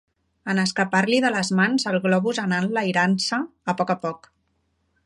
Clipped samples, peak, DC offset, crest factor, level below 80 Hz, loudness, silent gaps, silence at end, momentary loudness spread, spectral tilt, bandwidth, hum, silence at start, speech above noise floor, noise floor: under 0.1%; -6 dBFS; under 0.1%; 18 dB; -68 dBFS; -22 LUFS; none; 0.9 s; 7 LU; -5 dB/octave; 11.5 kHz; none; 0.45 s; 48 dB; -70 dBFS